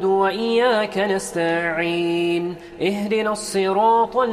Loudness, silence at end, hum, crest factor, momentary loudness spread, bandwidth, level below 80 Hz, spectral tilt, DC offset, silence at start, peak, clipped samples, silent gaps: -20 LUFS; 0 s; none; 14 dB; 6 LU; 14 kHz; -56 dBFS; -4.5 dB/octave; under 0.1%; 0 s; -6 dBFS; under 0.1%; none